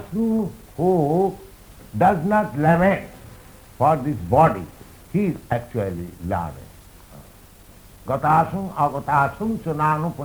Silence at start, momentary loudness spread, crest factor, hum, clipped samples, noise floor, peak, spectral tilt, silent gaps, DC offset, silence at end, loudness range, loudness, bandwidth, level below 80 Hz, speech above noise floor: 0 s; 14 LU; 18 dB; none; under 0.1%; -46 dBFS; -4 dBFS; -8 dB/octave; none; under 0.1%; 0 s; 8 LU; -21 LUFS; over 20 kHz; -46 dBFS; 26 dB